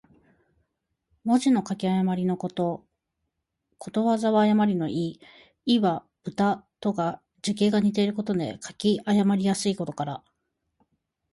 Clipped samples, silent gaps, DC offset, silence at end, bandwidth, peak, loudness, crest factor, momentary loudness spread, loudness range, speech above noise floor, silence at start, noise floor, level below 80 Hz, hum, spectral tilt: under 0.1%; none; under 0.1%; 1.15 s; 11.5 kHz; -10 dBFS; -25 LUFS; 16 dB; 12 LU; 2 LU; 56 dB; 1.25 s; -80 dBFS; -66 dBFS; none; -6 dB/octave